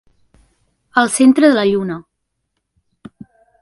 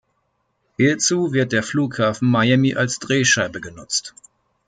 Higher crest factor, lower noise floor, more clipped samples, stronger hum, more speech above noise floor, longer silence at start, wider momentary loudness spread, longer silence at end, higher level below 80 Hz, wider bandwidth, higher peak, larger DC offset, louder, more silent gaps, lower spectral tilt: about the same, 16 dB vs 16 dB; first, -73 dBFS vs -69 dBFS; neither; neither; first, 60 dB vs 51 dB; first, 0.95 s vs 0.8 s; first, 14 LU vs 9 LU; first, 1.6 s vs 0.6 s; about the same, -60 dBFS vs -58 dBFS; first, 11.5 kHz vs 9.6 kHz; first, 0 dBFS vs -4 dBFS; neither; first, -13 LUFS vs -19 LUFS; neither; about the same, -4.5 dB/octave vs -4 dB/octave